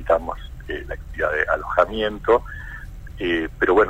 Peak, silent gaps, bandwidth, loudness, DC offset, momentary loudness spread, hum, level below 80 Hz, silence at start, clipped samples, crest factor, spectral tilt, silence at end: -4 dBFS; none; 15.5 kHz; -22 LUFS; under 0.1%; 16 LU; none; -36 dBFS; 0 s; under 0.1%; 18 dB; -6.5 dB/octave; 0 s